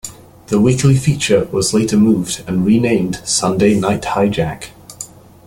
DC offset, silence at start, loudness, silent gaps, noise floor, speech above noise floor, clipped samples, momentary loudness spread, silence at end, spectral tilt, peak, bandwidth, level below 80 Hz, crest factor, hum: under 0.1%; 0.05 s; -15 LUFS; none; -35 dBFS; 21 dB; under 0.1%; 18 LU; 0.4 s; -5.5 dB/octave; 0 dBFS; 16.5 kHz; -42 dBFS; 14 dB; none